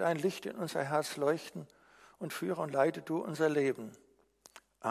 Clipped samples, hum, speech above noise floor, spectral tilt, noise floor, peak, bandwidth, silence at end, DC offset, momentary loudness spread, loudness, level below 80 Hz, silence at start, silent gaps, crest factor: under 0.1%; none; 30 dB; -5.5 dB/octave; -64 dBFS; -16 dBFS; 15.5 kHz; 0 s; under 0.1%; 15 LU; -34 LUFS; -80 dBFS; 0 s; none; 20 dB